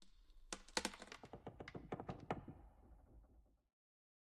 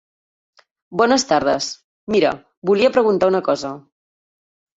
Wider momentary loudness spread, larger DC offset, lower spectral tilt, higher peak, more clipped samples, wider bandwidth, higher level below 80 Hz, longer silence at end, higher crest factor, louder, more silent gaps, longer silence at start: first, 23 LU vs 13 LU; neither; about the same, -3 dB/octave vs -4 dB/octave; second, -22 dBFS vs -2 dBFS; neither; first, 13 kHz vs 8 kHz; second, -66 dBFS vs -56 dBFS; second, 0.7 s vs 0.95 s; first, 32 dB vs 18 dB; second, -50 LUFS vs -18 LUFS; second, none vs 1.84-2.07 s, 2.57-2.62 s; second, 0 s vs 0.9 s